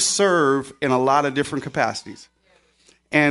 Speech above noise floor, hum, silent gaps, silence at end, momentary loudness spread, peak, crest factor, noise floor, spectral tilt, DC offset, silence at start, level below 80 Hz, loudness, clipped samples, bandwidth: 39 dB; none; none; 0 s; 8 LU; -2 dBFS; 18 dB; -60 dBFS; -3.5 dB/octave; under 0.1%; 0 s; -60 dBFS; -20 LUFS; under 0.1%; 11.5 kHz